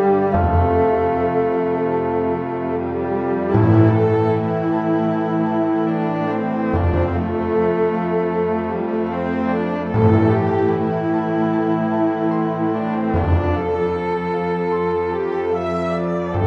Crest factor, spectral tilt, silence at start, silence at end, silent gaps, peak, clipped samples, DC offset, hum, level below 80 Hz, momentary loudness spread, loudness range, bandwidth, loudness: 16 dB; -10 dB/octave; 0 s; 0 s; none; -2 dBFS; under 0.1%; under 0.1%; none; -36 dBFS; 6 LU; 2 LU; 6.2 kHz; -19 LUFS